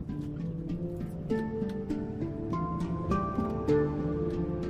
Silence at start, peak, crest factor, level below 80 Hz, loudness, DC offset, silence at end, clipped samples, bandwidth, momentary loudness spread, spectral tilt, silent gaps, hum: 0 s; -16 dBFS; 16 dB; -46 dBFS; -33 LUFS; under 0.1%; 0 s; under 0.1%; 9.4 kHz; 8 LU; -9 dB/octave; none; none